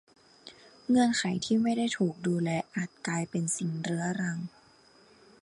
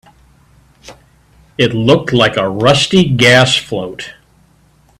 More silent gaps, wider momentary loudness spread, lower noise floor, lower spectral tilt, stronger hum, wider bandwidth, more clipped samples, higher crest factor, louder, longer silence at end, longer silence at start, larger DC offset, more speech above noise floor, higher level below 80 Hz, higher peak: neither; about the same, 17 LU vs 18 LU; first, -60 dBFS vs -50 dBFS; about the same, -5 dB/octave vs -4.5 dB/octave; neither; second, 11.5 kHz vs 13.5 kHz; neither; about the same, 16 dB vs 14 dB; second, -30 LUFS vs -11 LUFS; about the same, 0.95 s vs 0.9 s; second, 0.45 s vs 0.85 s; neither; second, 31 dB vs 39 dB; second, -70 dBFS vs -44 dBFS; second, -16 dBFS vs 0 dBFS